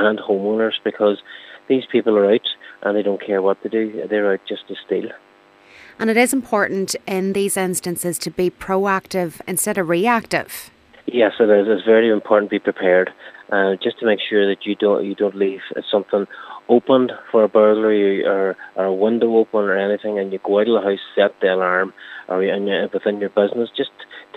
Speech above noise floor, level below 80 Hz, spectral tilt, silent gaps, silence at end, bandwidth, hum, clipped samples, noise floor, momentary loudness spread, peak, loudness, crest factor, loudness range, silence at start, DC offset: 31 dB; -62 dBFS; -4.5 dB/octave; none; 0.15 s; 15.5 kHz; none; under 0.1%; -49 dBFS; 9 LU; -2 dBFS; -18 LUFS; 16 dB; 4 LU; 0 s; under 0.1%